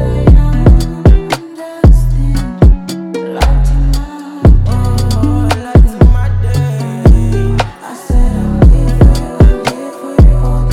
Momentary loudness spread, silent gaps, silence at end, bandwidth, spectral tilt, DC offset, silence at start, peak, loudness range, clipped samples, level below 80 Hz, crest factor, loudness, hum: 10 LU; none; 0 s; 13 kHz; -7.5 dB/octave; under 0.1%; 0 s; 0 dBFS; 2 LU; 6%; -10 dBFS; 8 dB; -11 LUFS; none